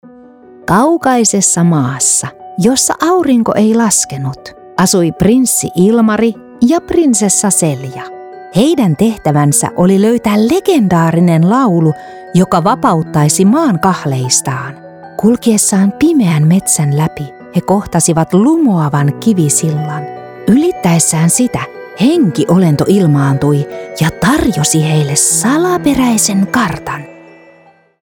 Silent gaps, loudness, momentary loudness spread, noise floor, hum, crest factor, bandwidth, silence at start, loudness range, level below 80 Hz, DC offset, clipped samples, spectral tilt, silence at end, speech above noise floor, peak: none; -11 LUFS; 10 LU; -45 dBFS; none; 10 dB; 18.5 kHz; 0.7 s; 2 LU; -42 dBFS; under 0.1%; under 0.1%; -5 dB/octave; 0.9 s; 35 dB; 0 dBFS